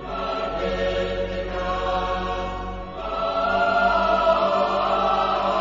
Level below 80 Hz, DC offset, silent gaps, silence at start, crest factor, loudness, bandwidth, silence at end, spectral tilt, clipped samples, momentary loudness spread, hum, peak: -38 dBFS; under 0.1%; none; 0 s; 16 dB; -23 LUFS; 7.6 kHz; 0 s; -5.5 dB/octave; under 0.1%; 9 LU; none; -6 dBFS